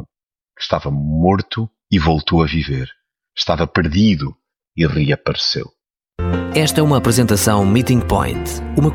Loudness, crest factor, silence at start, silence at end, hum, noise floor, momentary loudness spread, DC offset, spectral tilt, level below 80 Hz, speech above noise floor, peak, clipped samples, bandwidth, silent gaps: -17 LUFS; 16 dB; 0 s; 0 s; none; -80 dBFS; 11 LU; under 0.1%; -5.5 dB/octave; -32 dBFS; 64 dB; -2 dBFS; under 0.1%; 16.5 kHz; none